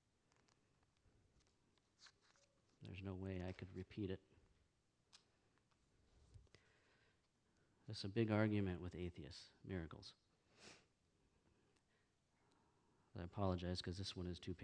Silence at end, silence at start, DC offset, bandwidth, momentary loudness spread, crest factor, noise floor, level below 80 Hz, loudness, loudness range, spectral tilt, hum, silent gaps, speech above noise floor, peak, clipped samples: 0 s; 2 s; under 0.1%; 9.6 kHz; 23 LU; 26 dB; -83 dBFS; -72 dBFS; -47 LUFS; 14 LU; -6.5 dB/octave; none; none; 36 dB; -26 dBFS; under 0.1%